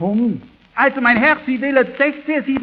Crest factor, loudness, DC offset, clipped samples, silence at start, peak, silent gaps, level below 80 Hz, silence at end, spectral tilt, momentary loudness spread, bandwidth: 16 dB; -16 LUFS; under 0.1%; under 0.1%; 0 s; 0 dBFS; none; -54 dBFS; 0 s; -9 dB/octave; 8 LU; 5.2 kHz